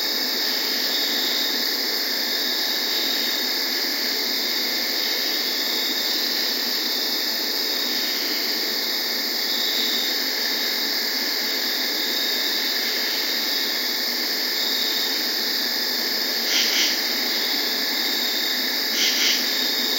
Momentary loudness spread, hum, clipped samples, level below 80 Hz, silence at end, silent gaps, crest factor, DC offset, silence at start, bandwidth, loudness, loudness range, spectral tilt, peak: 2 LU; none; under 0.1%; under -90 dBFS; 0 s; none; 16 dB; under 0.1%; 0 s; 16.5 kHz; -20 LUFS; 1 LU; 1.5 dB/octave; -6 dBFS